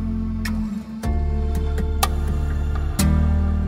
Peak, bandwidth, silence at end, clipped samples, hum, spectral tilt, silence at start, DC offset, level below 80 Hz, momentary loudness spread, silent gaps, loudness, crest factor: -2 dBFS; 16 kHz; 0 s; under 0.1%; none; -6 dB/octave; 0 s; under 0.1%; -22 dBFS; 7 LU; none; -23 LUFS; 18 dB